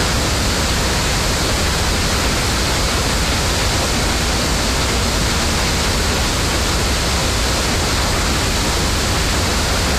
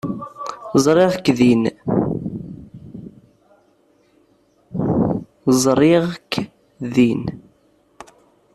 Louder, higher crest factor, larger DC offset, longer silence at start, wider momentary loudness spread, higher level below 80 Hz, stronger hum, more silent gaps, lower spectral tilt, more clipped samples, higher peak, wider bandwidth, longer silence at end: about the same, -16 LUFS vs -18 LUFS; second, 10 dB vs 18 dB; neither; about the same, 0 s vs 0.05 s; second, 0 LU vs 20 LU; first, -22 dBFS vs -50 dBFS; neither; neither; second, -3 dB/octave vs -6 dB/octave; neither; second, -6 dBFS vs -2 dBFS; first, 15.5 kHz vs 13.5 kHz; second, 0 s vs 1.15 s